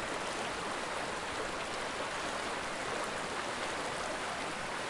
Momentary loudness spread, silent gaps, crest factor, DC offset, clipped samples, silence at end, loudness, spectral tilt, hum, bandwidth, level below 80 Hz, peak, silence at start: 1 LU; none; 14 dB; under 0.1%; under 0.1%; 0 s; -37 LUFS; -2.5 dB/octave; none; 11.5 kHz; -60 dBFS; -24 dBFS; 0 s